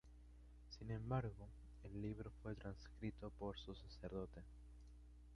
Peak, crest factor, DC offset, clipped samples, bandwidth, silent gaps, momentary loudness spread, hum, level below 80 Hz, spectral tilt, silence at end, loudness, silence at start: -30 dBFS; 22 dB; under 0.1%; under 0.1%; 11 kHz; none; 19 LU; 60 Hz at -60 dBFS; -60 dBFS; -7.5 dB/octave; 0 s; -51 LUFS; 0.05 s